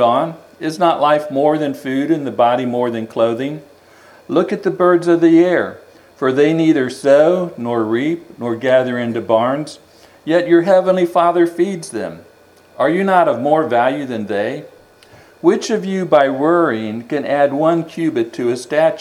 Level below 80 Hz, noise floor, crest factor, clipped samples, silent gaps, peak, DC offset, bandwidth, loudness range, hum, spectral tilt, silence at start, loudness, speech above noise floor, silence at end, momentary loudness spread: -66 dBFS; -47 dBFS; 16 dB; under 0.1%; none; 0 dBFS; under 0.1%; 12.5 kHz; 3 LU; none; -6.5 dB/octave; 0 s; -16 LUFS; 32 dB; 0 s; 11 LU